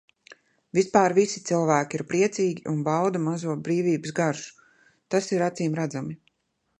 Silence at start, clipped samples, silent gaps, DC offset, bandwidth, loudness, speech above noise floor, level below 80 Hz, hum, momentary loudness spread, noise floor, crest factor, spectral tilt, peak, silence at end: 0.3 s; under 0.1%; none; under 0.1%; 11 kHz; -25 LUFS; 51 dB; -70 dBFS; none; 9 LU; -75 dBFS; 22 dB; -5.5 dB/octave; -4 dBFS; 0.65 s